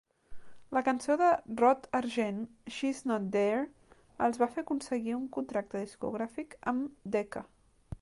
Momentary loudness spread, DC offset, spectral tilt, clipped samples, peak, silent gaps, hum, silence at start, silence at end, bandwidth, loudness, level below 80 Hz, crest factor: 12 LU; under 0.1%; -5.5 dB/octave; under 0.1%; -14 dBFS; none; none; 0.3 s; 0.05 s; 11.5 kHz; -32 LUFS; -62 dBFS; 20 dB